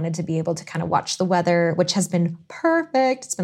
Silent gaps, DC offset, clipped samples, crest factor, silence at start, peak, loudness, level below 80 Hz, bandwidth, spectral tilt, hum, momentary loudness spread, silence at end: none; under 0.1%; under 0.1%; 16 dB; 0 s; -6 dBFS; -22 LUFS; -66 dBFS; 14 kHz; -5 dB/octave; none; 6 LU; 0 s